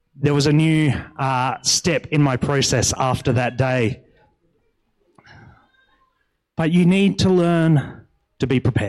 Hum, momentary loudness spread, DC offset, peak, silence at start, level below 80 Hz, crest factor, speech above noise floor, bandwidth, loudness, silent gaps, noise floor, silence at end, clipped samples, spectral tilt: none; 8 LU; under 0.1%; -6 dBFS; 0.2 s; -48 dBFS; 14 dB; 51 dB; 13 kHz; -18 LUFS; none; -69 dBFS; 0 s; under 0.1%; -5 dB/octave